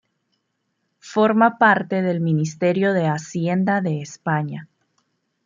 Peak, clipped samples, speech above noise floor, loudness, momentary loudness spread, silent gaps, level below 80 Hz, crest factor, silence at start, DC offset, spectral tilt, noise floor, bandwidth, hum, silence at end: -2 dBFS; under 0.1%; 54 dB; -20 LUFS; 10 LU; none; -68 dBFS; 18 dB; 1.05 s; under 0.1%; -7 dB/octave; -73 dBFS; 7.6 kHz; none; 0.8 s